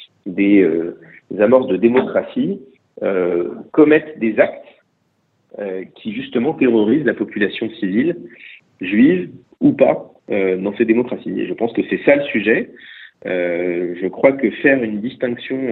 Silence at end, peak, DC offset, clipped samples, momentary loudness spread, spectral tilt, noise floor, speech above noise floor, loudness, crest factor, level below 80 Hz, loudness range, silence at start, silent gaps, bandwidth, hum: 0 s; 0 dBFS; under 0.1%; under 0.1%; 14 LU; -9.5 dB/octave; -64 dBFS; 48 dB; -17 LUFS; 18 dB; -60 dBFS; 2 LU; 0 s; none; 4.2 kHz; none